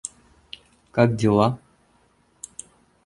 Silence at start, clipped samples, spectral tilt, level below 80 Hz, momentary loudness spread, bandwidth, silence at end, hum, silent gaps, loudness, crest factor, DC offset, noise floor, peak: 0.05 s; under 0.1%; -6.5 dB/octave; -56 dBFS; 23 LU; 11.5 kHz; 1.5 s; none; none; -21 LUFS; 22 dB; under 0.1%; -62 dBFS; -2 dBFS